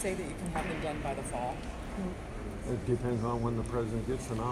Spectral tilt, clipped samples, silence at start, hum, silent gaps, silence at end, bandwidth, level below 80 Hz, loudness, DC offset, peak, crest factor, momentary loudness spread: -6.5 dB/octave; under 0.1%; 0 s; none; none; 0 s; 14.5 kHz; -44 dBFS; -35 LUFS; under 0.1%; -18 dBFS; 16 dB; 8 LU